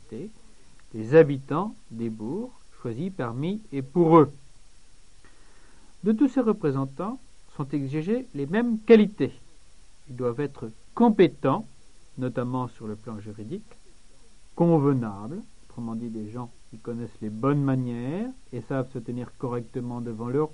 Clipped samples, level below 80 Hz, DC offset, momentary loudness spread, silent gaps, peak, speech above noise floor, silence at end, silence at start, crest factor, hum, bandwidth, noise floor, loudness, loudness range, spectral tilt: under 0.1%; -56 dBFS; 0.5%; 20 LU; none; -4 dBFS; 28 dB; 0.05 s; 0.1 s; 22 dB; none; 10.5 kHz; -54 dBFS; -26 LUFS; 6 LU; -8.5 dB/octave